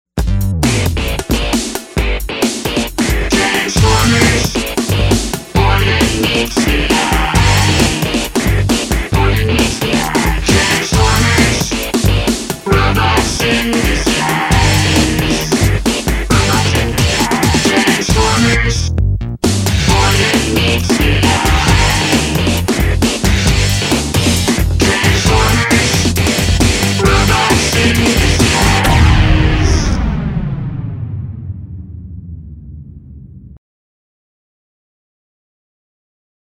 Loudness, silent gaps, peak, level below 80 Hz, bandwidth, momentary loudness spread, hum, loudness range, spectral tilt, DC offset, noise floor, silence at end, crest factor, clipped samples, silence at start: -12 LUFS; none; 0 dBFS; -20 dBFS; 16.5 kHz; 7 LU; none; 4 LU; -4 dB/octave; under 0.1%; -34 dBFS; 2.9 s; 12 dB; under 0.1%; 0.15 s